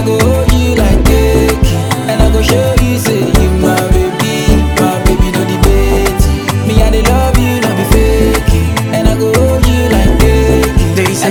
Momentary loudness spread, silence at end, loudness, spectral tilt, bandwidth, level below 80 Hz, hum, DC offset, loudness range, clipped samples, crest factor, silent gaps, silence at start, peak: 3 LU; 0 s; -10 LUFS; -5.5 dB/octave; over 20 kHz; -14 dBFS; none; under 0.1%; 1 LU; 0.7%; 8 dB; none; 0 s; 0 dBFS